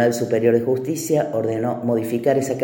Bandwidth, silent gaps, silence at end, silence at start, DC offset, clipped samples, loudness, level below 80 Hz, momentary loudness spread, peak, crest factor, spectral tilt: 17 kHz; none; 0 s; 0 s; under 0.1%; under 0.1%; -20 LUFS; -64 dBFS; 5 LU; -4 dBFS; 16 dB; -6 dB/octave